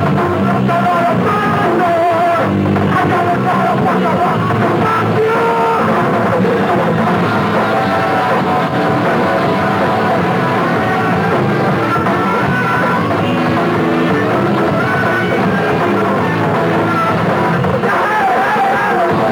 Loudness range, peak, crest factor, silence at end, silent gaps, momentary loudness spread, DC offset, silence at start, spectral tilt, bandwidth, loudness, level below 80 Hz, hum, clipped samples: 1 LU; -2 dBFS; 12 dB; 0 s; none; 1 LU; under 0.1%; 0 s; -7 dB/octave; 19 kHz; -13 LUFS; -48 dBFS; none; under 0.1%